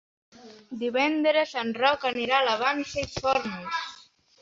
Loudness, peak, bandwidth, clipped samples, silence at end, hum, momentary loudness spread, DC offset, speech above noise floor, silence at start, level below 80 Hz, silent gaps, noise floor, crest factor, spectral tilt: -26 LUFS; -8 dBFS; 7.8 kHz; under 0.1%; 0.45 s; none; 9 LU; under 0.1%; 28 dB; 0.35 s; -58 dBFS; none; -53 dBFS; 18 dB; -3.5 dB/octave